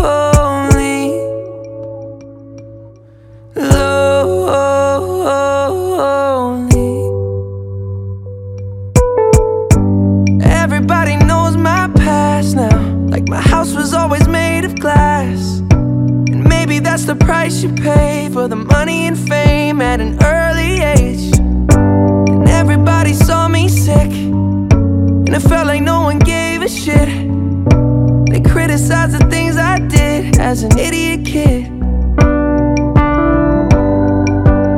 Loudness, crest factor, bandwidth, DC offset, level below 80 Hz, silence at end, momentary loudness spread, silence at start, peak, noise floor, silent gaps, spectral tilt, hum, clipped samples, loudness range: -12 LUFS; 12 dB; 15.5 kHz; under 0.1%; -20 dBFS; 0 s; 7 LU; 0 s; 0 dBFS; -39 dBFS; none; -6.5 dB/octave; none; 1%; 4 LU